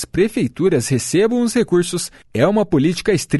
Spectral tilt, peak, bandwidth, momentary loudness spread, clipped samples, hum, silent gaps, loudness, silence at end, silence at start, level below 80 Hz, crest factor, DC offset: -5.5 dB/octave; -2 dBFS; 12 kHz; 3 LU; under 0.1%; none; none; -17 LUFS; 0 s; 0 s; -44 dBFS; 14 dB; under 0.1%